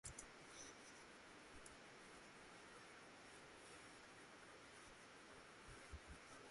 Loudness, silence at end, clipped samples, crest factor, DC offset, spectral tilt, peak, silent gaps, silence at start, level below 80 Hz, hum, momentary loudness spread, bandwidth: -61 LUFS; 0 s; under 0.1%; 26 dB; under 0.1%; -2.5 dB/octave; -36 dBFS; none; 0.05 s; -72 dBFS; none; 3 LU; 11.5 kHz